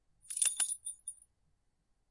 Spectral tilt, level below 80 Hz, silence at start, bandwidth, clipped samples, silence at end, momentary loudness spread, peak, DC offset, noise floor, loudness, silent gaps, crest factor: 4 dB/octave; -78 dBFS; 0.25 s; 11.5 kHz; under 0.1%; 0.95 s; 16 LU; -14 dBFS; under 0.1%; -77 dBFS; -33 LUFS; none; 26 dB